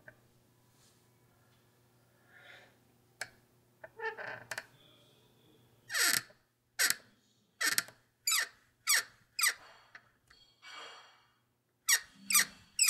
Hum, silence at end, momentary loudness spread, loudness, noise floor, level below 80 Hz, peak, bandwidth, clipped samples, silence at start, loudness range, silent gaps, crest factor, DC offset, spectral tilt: none; 0 s; 21 LU; -32 LUFS; -77 dBFS; -82 dBFS; -6 dBFS; 16 kHz; under 0.1%; 2.5 s; 16 LU; none; 32 dB; under 0.1%; 2 dB/octave